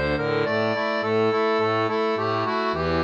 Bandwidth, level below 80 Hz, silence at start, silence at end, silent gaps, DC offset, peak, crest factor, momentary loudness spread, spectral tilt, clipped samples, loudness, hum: 7.4 kHz; -46 dBFS; 0 s; 0 s; none; under 0.1%; -12 dBFS; 10 dB; 3 LU; -6.5 dB/octave; under 0.1%; -23 LUFS; none